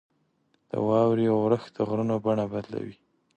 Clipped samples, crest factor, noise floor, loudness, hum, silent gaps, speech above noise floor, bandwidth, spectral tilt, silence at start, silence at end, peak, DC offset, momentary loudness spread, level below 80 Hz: under 0.1%; 16 dB; -70 dBFS; -26 LUFS; none; none; 45 dB; 8.6 kHz; -9 dB/octave; 0.75 s; 0.45 s; -10 dBFS; under 0.1%; 13 LU; -64 dBFS